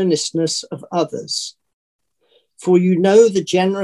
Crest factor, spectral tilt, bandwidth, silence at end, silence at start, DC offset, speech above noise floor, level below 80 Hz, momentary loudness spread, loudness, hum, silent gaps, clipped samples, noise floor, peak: 16 dB; -5 dB/octave; 12 kHz; 0 s; 0 s; under 0.1%; 44 dB; -64 dBFS; 12 LU; -17 LUFS; none; 1.74-1.99 s; under 0.1%; -60 dBFS; 0 dBFS